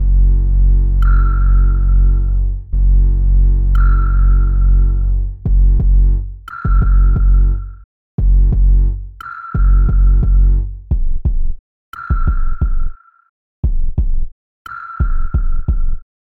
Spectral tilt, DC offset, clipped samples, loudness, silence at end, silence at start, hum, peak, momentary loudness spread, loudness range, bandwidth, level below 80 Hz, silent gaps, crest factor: -10.5 dB/octave; under 0.1%; under 0.1%; -16 LUFS; 0.35 s; 0 s; none; -4 dBFS; 13 LU; 8 LU; 1.8 kHz; -12 dBFS; 7.84-8.18 s, 11.59-11.92 s, 13.29-13.63 s, 14.32-14.65 s; 8 dB